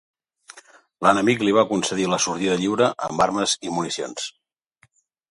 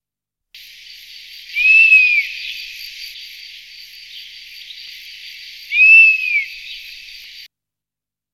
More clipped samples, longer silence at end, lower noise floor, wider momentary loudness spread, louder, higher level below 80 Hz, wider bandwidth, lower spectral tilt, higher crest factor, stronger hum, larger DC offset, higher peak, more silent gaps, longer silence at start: neither; second, 1 s vs 1.4 s; second, -62 dBFS vs -88 dBFS; second, 9 LU vs 27 LU; second, -21 LUFS vs -9 LUFS; about the same, -60 dBFS vs -60 dBFS; second, 11.5 kHz vs 15 kHz; first, -3.5 dB/octave vs 4.5 dB/octave; about the same, 20 dB vs 16 dB; second, none vs 50 Hz at -80 dBFS; neither; about the same, -2 dBFS vs -2 dBFS; neither; second, 0.55 s vs 1.5 s